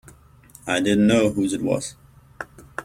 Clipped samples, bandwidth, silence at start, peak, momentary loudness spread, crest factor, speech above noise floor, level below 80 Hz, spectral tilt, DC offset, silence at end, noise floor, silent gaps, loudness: under 0.1%; 15 kHz; 0.65 s; -6 dBFS; 21 LU; 18 dB; 30 dB; -52 dBFS; -5 dB/octave; under 0.1%; 0 s; -50 dBFS; none; -21 LUFS